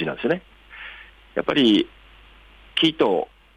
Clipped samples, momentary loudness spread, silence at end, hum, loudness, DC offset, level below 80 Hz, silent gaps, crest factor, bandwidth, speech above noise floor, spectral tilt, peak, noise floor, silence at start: under 0.1%; 21 LU; 0.3 s; none; -21 LUFS; under 0.1%; -54 dBFS; none; 16 dB; 10 kHz; 29 dB; -5.5 dB/octave; -8 dBFS; -49 dBFS; 0 s